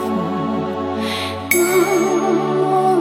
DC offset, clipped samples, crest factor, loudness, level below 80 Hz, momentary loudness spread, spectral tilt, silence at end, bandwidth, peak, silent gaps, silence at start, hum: under 0.1%; under 0.1%; 18 dB; -18 LUFS; -58 dBFS; 7 LU; -4.5 dB/octave; 0 s; 16.5 kHz; 0 dBFS; none; 0 s; none